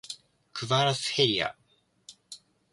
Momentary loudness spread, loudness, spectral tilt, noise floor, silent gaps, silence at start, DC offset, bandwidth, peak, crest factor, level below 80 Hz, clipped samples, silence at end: 23 LU; -26 LUFS; -3.5 dB/octave; -56 dBFS; none; 0.05 s; under 0.1%; 11.5 kHz; -10 dBFS; 22 dB; -66 dBFS; under 0.1%; 0.35 s